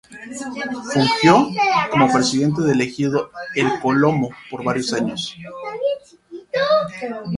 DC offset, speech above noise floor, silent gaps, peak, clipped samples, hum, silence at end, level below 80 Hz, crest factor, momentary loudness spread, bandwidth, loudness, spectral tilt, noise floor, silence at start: under 0.1%; 21 dB; none; 0 dBFS; under 0.1%; none; 0 s; -56 dBFS; 20 dB; 14 LU; 11.5 kHz; -19 LUFS; -5 dB/octave; -40 dBFS; 0.1 s